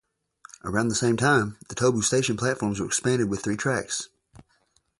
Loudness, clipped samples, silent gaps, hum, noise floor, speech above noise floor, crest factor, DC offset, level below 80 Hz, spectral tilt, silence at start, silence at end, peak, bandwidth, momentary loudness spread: -25 LUFS; under 0.1%; none; none; -68 dBFS; 43 dB; 18 dB; under 0.1%; -54 dBFS; -4 dB/octave; 0.65 s; 0.95 s; -8 dBFS; 11.5 kHz; 10 LU